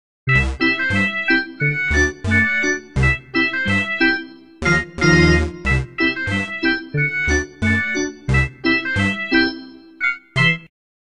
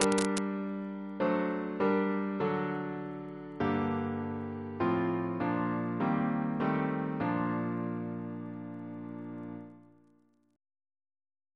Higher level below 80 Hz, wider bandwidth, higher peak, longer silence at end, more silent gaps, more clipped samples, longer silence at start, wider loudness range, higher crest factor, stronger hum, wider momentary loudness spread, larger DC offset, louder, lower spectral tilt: first, -30 dBFS vs -68 dBFS; about the same, 10.5 kHz vs 11 kHz; first, -2 dBFS vs -6 dBFS; second, 0.45 s vs 1.75 s; neither; neither; first, 0.25 s vs 0 s; second, 2 LU vs 9 LU; second, 16 dB vs 26 dB; neither; second, 6 LU vs 12 LU; first, 0.5% vs under 0.1%; first, -18 LUFS vs -33 LUFS; about the same, -5 dB/octave vs -6 dB/octave